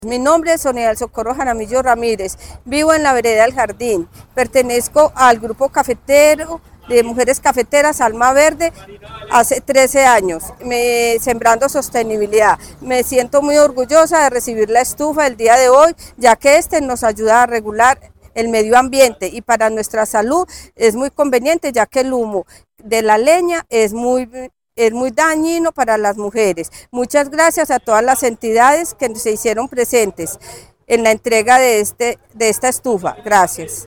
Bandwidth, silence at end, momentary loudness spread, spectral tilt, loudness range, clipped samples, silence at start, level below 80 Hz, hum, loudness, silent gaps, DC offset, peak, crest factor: 19.5 kHz; 0.05 s; 10 LU; -3 dB/octave; 4 LU; under 0.1%; 0 s; -42 dBFS; none; -14 LUFS; none; 0.1%; 0 dBFS; 14 dB